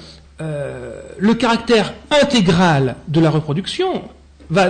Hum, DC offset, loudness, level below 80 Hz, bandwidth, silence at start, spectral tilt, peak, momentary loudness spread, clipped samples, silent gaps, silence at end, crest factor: none; under 0.1%; -16 LUFS; -42 dBFS; 9.6 kHz; 0 s; -6 dB/octave; -6 dBFS; 14 LU; under 0.1%; none; 0 s; 12 dB